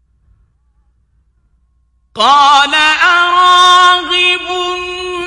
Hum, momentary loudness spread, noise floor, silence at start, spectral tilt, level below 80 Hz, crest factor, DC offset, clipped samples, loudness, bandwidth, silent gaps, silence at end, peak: none; 12 LU; -56 dBFS; 2.15 s; -0.5 dB/octave; -48 dBFS; 12 dB; under 0.1%; 0.1%; -8 LUFS; 11.5 kHz; none; 0 s; 0 dBFS